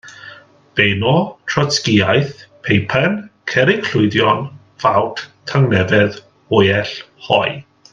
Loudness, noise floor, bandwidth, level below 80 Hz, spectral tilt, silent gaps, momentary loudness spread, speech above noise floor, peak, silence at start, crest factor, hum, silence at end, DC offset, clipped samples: -16 LUFS; -41 dBFS; 7.6 kHz; -52 dBFS; -5.5 dB/octave; none; 14 LU; 25 dB; 0 dBFS; 0.05 s; 16 dB; none; 0.3 s; under 0.1%; under 0.1%